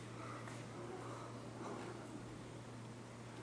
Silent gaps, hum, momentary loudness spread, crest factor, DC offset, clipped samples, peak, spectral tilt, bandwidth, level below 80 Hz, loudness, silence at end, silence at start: none; none; 4 LU; 14 dB; under 0.1%; under 0.1%; -36 dBFS; -5.5 dB/octave; 11 kHz; -72 dBFS; -50 LUFS; 0 s; 0 s